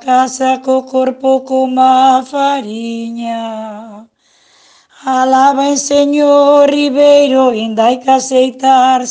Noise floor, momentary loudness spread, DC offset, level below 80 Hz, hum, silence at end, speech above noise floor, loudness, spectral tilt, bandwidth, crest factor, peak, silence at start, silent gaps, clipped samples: -50 dBFS; 13 LU; under 0.1%; -60 dBFS; none; 0 s; 40 dB; -11 LUFS; -3 dB/octave; 9.8 kHz; 10 dB; 0 dBFS; 0.05 s; none; under 0.1%